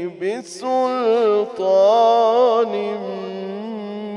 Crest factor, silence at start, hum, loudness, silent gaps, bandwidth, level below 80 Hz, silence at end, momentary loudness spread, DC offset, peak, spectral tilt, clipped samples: 14 dB; 0 s; none; -18 LUFS; none; 11 kHz; -74 dBFS; 0 s; 14 LU; under 0.1%; -4 dBFS; -5 dB/octave; under 0.1%